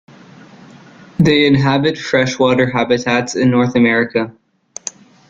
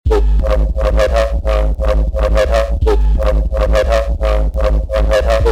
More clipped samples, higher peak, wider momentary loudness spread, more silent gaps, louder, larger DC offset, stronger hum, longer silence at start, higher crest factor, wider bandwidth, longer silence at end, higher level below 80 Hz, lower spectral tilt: neither; about the same, -2 dBFS vs 0 dBFS; first, 16 LU vs 3 LU; neither; about the same, -14 LUFS vs -15 LUFS; neither; neither; first, 1.2 s vs 0.05 s; about the same, 14 dB vs 12 dB; second, 7.6 kHz vs 9.2 kHz; first, 0.4 s vs 0 s; second, -48 dBFS vs -14 dBFS; about the same, -5.5 dB/octave vs -6.5 dB/octave